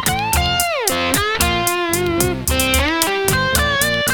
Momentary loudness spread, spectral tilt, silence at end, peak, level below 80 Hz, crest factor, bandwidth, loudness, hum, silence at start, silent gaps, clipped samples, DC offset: 2 LU; -3 dB/octave; 0 s; 0 dBFS; -28 dBFS; 18 dB; over 20 kHz; -16 LUFS; none; 0 s; none; under 0.1%; under 0.1%